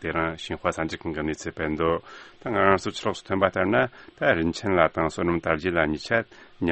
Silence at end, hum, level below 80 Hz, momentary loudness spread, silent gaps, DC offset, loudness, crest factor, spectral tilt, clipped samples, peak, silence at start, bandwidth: 0 s; none; -48 dBFS; 8 LU; none; under 0.1%; -25 LUFS; 22 dB; -5.5 dB/octave; under 0.1%; -2 dBFS; 0 s; 8.4 kHz